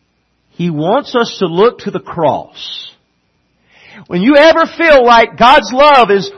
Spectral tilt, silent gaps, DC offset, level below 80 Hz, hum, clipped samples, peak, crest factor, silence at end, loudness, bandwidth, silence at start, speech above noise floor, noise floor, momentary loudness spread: -5 dB/octave; none; under 0.1%; -42 dBFS; none; 0.3%; 0 dBFS; 10 dB; 0.05 s; -9 LUFS; 10.5 kHz; 0.6 s; 50 dB; -60 dBFS; 15 LU